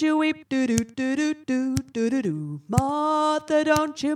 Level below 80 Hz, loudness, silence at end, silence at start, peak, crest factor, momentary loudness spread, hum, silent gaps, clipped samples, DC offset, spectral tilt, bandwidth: -50 dBFS; -24 LUFS; 0 s; 0 s; 0 dBFS; 22 dB; 5 LU; none; none; under 0.1%; under 0.1%; -5.5 dB/octave; 16 kHz